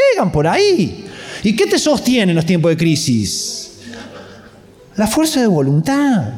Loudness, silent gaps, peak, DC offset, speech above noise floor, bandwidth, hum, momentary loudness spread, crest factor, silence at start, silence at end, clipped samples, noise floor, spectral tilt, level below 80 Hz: -14 LUFS; none; -4 dBFS; under 0.1%; 28 dB; 16.5 kHz; none; 17 LU; 12 dB; 0 s; 0 s; under 0.1%; -42 dBFS; -5 dB/octave; -44 dBFS